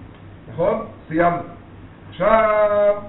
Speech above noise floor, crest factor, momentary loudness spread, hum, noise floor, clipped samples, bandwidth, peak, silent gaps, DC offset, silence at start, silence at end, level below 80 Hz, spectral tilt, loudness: 23 dB; 18 dB; 20 LU; none; -41 dBFS; under 0.1%; 4.1 kHz; 0 dBFS; none; under 0.1%; 0 s; 0 s; -44 dBFS; -5 dB/octave; -19 LUFS